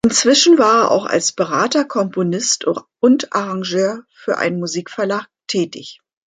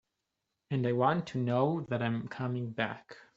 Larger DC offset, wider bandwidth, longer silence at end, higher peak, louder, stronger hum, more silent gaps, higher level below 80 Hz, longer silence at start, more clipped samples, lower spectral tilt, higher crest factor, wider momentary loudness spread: neither; first, 9.6 kHz vs 7.6 kHz; first, 0.45 s vs 0.15 s; first, 0 dBFS vs -12 dBFS; first, -16 LUFS vs -32 LUFS; neither; neither; first, -58 dBFS vs -72 dBFS; second, 0.05 s vs 0.7 s; neither; second, -3.5 dB/octave vs -6 dB/octave; about the same, 16 dB vs 20 dB; first, 12 LU vs 7 LU